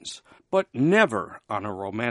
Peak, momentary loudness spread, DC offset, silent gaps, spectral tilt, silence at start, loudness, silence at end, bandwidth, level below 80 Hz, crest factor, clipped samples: -4 dBFS; 14 LU; under 0.1%; none; -5.5 dB/octave; 0.05 s; -24 LUFS; 0 s; 11.5 kHz; -66 dBFS; 22 dB; under 0.1%